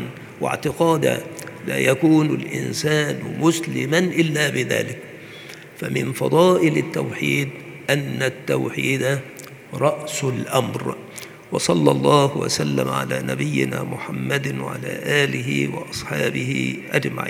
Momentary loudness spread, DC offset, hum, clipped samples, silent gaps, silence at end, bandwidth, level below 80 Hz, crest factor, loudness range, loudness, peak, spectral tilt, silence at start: 13 LU; under 0.1%; none; under 0.1%; none; 0 s; 18.5 kHz; -60 dBFS; 22 dB; 3 LU; -21 LUFS; 0 dBFS; -5 dB/octave; 0 s